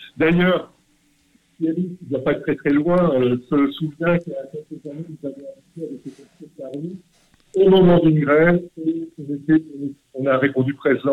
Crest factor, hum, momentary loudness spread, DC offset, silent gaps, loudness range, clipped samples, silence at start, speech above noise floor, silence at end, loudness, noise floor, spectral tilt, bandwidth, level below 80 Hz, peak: 14 dB; none; 19 LU; under 0.1%; none; 10 LU; under 0.1%; 0 s; 41 dB; 0 s; -19 LUFS; -60 dBFS; -9 dB/octave; 4.5 kHz; -50 dBFS; -4 dBFS